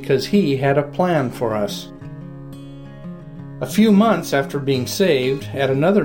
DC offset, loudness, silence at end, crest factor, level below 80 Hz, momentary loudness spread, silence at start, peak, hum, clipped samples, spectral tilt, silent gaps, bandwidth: under 0.1%; -18 LUFS; 0 s; 14 dB; -48 dBFS; 21 LU; 0 s; -4 dBFS; none; under 0.1%; -6 dB/octave; none; 17 kHz